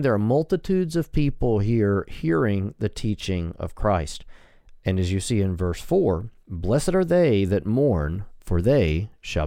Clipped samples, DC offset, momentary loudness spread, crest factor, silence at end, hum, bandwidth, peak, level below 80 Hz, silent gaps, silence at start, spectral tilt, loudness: under 0.1%; under 0.1%; 9 LU; 14 dB; 0 s; none; 15.5 kHz; -8 dBFS; -36 dBFS; none; 0 s; -7 dB/octave; -23 LUFS